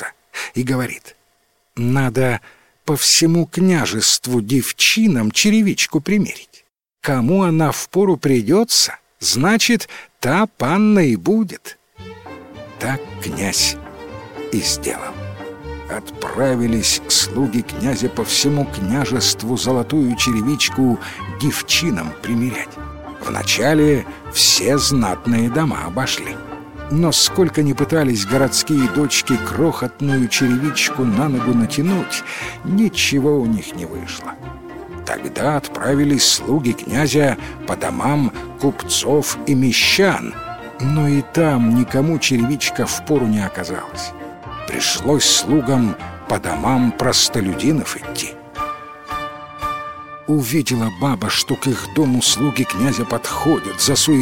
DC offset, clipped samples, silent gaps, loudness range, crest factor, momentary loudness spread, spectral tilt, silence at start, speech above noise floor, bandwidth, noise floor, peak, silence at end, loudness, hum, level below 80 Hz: 0.5%; under 0.1%; none; 5 LU; 18 dB; 15 LU; -4 dB/octave; 0 s; 45 dB; 17 kHz; -62 dBFS; 0 dBFS; 0 s; -17 LUFS; none; -44 dBFS